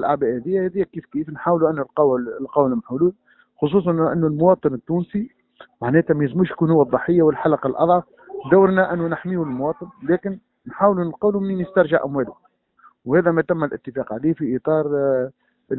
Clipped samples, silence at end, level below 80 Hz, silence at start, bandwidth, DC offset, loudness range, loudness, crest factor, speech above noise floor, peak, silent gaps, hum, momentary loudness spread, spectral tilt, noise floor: under 0.1%; 0 s; -54 dBFS; 0 s; 4.1 kHz; under 0.1%; 4 LU; -20 LUFS; 18 dB; 35 dB; -2 dBFS; none; none; 11 LU; -13 dB/octave; -54 dBFS